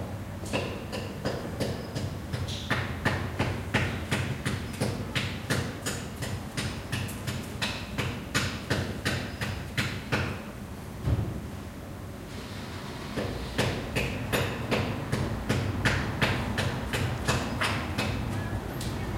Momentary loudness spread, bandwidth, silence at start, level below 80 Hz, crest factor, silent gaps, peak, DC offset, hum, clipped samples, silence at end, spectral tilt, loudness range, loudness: 9 LU; 16.5 kHz; 0 s; -44 dBFS; 20 dB; none; -10 dBFS; under 0.1%; none; under 0.1%; 0 s; -5 dB/octave; 5 LU; -31 LUFS